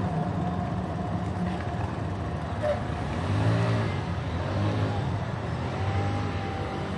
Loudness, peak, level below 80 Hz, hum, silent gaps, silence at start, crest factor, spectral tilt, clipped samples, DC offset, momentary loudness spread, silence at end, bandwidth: -29 LUFS; -14 dBFS; -44 dBFS; none; none; 0 s; 14 dB; -7.5 dB/octave; under 0.1%; under 0.1%; 6 LU; 0 s; 11 kHz